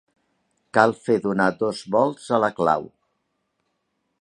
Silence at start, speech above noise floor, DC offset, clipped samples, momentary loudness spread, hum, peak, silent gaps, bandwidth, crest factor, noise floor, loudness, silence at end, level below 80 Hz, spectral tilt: 0.75 s; 53 dB; under 0.1%; under 0.1%; 5 LU; none; 0 dBFS; none; 11 kHz; 24 dB; -74 dBFS; -22 LUFS; 1.35 s; -64 dBFS; -6 dB/octave